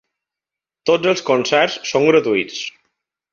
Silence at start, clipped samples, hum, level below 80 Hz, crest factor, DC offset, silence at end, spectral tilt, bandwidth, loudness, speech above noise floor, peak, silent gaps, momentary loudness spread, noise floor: 0.85 s; under 0.1%; none; -62 dBFS; 18 dB; under 0.1%; 0.65 s; -4 dB/octave; 7.4 kHz; -17 LUFS; 71 dB; -2 dBFS; none; 11 LU; -87 dBFS